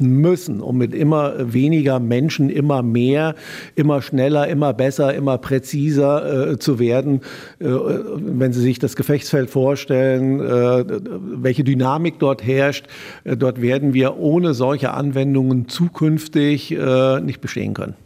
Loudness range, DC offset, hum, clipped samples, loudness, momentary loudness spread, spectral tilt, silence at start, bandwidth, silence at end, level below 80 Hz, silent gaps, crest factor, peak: 2 LU; under 0.1%; none; under 0.1%; -18 LUFS; 7 LU; -7.5 dB/octave; 0 s; 16 kHz; 0.1 s; -58 dBFS; none; 14 dB; -4 dBFS